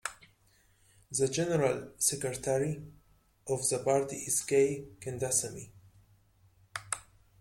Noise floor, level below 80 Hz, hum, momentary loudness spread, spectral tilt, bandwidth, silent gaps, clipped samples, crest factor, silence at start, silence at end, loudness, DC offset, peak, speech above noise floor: -67 dBFS; -64 dBFS; none; 14 LU; -4 dB/octave; 16.5 kHz; none; under 0.1%; 22 dB; 0.05 s; 0.4 s; -31 LUFS; under 0.1%; -12 dBFS; 35 dB